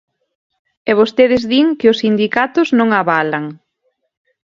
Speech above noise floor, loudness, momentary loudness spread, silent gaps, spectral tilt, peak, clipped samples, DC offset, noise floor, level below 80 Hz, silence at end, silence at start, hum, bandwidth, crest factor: 54 dB; -14 LUFS; 8 LU; none; -6 dB/octave; 0 dBFS; under 0.1%; under 0.1%; -67 dBFS; -54 dBFS; 0.95 s; 0.85 s; none; 7.4 kHz; 16 dB